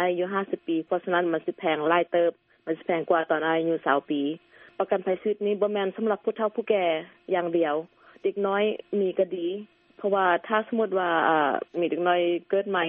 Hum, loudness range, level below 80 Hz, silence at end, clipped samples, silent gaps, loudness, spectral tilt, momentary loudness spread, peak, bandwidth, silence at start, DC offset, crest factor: none; 2 LU; -76 dBFS; 0 s; under 0.1%; none; -26 LUFS; -3.5 dB/octave; 8 LU; -6 dBFS; 3.8 kHz; 0 s; under 0.1%; 20 dB